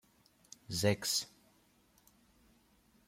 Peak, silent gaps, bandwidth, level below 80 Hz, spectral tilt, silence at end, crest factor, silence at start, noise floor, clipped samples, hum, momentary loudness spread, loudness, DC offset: -16 dBFS; none; 16.5 kHz; -72 dBFS; -3.5 dB/octave; 1.8 s; 26 dB; 0.7 s; -70 dBFS; under 0.1%; none; 24 LU; -34 LUFS; under 0.1%